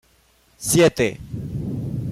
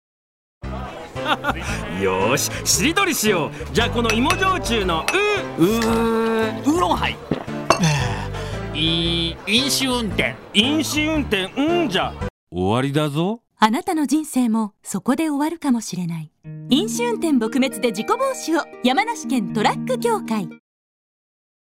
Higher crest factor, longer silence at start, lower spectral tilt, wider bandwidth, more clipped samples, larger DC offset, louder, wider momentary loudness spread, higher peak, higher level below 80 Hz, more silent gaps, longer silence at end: about the same, 16 dB vs 18 dB; about the same, 0.6 s vs 0.65 s; about the same, -4.5 dB/octave vs -4 dB/octave; about the same, 16 kHz vs 16 kHz; neither; neither; about the same, -21 LUFS vs -20 LUFS; first, 14 LU vs 9 LU; second, -6 dBFS vs -2 dBFS; about the same, -44 dBFS vs -40 dBFS; second, none vs 12.30-12.47 s; second, 0 s vs 1.05 s